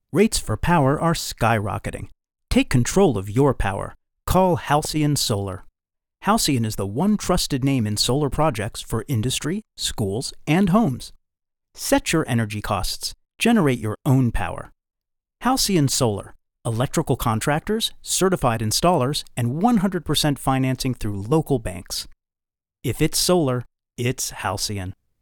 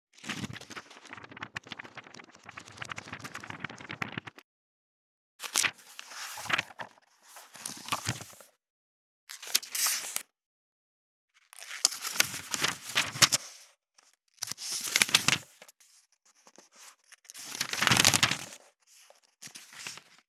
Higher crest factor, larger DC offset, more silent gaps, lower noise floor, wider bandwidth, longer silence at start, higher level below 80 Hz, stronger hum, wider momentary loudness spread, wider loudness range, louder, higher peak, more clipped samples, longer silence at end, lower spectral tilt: second, 18 dB vs 34 dB; neither; second, none vs 4.44-5.39 s, 8.70-9.27 s, 10.46-11.28 s; first, -89 dBFS vs -67 dBFS; about the same, over 20 kHz vs 18.5 kHz; about the same, 0.15 s vs 0.25 s; first, -38 dBFS vs -74 dBFS; neither; second, 11 LU vs 24 LU; second, 3 LU vs 14 LU; first, -22 LUFS vs -29 LUFS; about the same, -4 dBFS vs -2 dBFS; neither; about the same, 0.3 s vs 0.3 s; first, -5 dB/octave vs -0.5 dB/octave